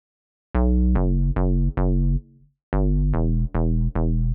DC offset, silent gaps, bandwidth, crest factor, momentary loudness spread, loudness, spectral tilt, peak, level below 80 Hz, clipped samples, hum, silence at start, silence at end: under 0.1%; 2.63-2.72 s; 2.8 kHz; 12 dB; 5 LU; -23 LUFS; -14 dB/octave; -8 dBFS; -22 dBFS; under 0.1%; none; 0.55 s; 0 s